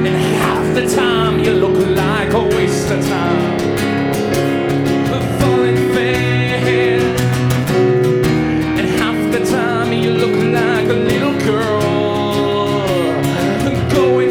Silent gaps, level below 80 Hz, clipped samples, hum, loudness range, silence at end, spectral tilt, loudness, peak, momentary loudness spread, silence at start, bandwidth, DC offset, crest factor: none; -36 dBFS; under 0.1%; none; 1 LU; 0 s; -6 dB/octave; -15 LUFS; 0 dBFS; 3 LU; 0 s; over 20 kHz; under 0.1%; 14 dB